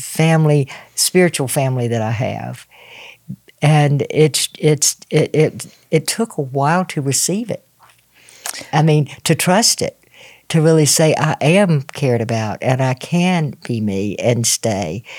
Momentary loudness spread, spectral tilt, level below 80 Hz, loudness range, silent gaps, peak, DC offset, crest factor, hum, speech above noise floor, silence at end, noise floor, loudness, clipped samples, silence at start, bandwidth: 13 LU; -4.5 dB/octave; -62 dBFS; 4 LU; none; 0 dBFS; under 0.1%; 16 dB; none; 35 dB; 0 s; -51 dBFS; -16 LUFS; under 0.1%; 0 s; 17 kHz